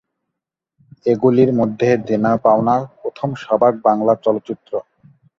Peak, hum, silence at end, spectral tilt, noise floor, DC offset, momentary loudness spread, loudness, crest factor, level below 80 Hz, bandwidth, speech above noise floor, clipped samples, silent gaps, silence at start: -2 dBFS; none; 0.55 s; -8.5 dB/octave; -81 dBFS; under 0.1%; 12 LU; -17 LUFS; 16 dB; -58 dBFS; 7.2 kHz; 65 dB; under 0.1%; none; 1.05 s